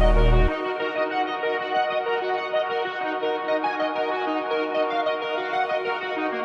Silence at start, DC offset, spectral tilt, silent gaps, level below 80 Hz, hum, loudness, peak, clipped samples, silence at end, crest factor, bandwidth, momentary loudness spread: 0 s; under 0.1%; -7 dB/octave; none; -28 dBFS; none; -25 LUFS; -6 dBFS; under 0.1%; 0 s; 16 dB; 6.2 kHz; 4 LU